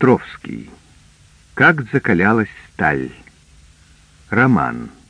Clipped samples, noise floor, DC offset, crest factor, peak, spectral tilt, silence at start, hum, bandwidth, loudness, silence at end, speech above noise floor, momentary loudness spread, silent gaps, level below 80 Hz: under 0.1%; -49 dBFS; under 0.1%; 18 dB; 0 dBFS; -8 dB/octave; 0 s; none; 10 kHz; -16 LUFS; 0.2 s; 32 dB; 18 LU; none; -48 dBFS